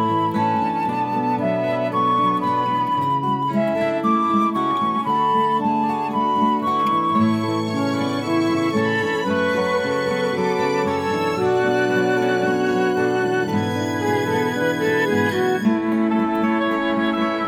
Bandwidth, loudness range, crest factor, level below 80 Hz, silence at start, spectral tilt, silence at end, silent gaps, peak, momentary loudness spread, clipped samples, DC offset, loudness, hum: 16 kHz; 1 LU; 12 dB; -60 dBFS; 0 s; -6 dB/octave; 0 s; none; -8 dBFS; 3 LU; under 0.1%; under 0.1%; -20 LUFS; none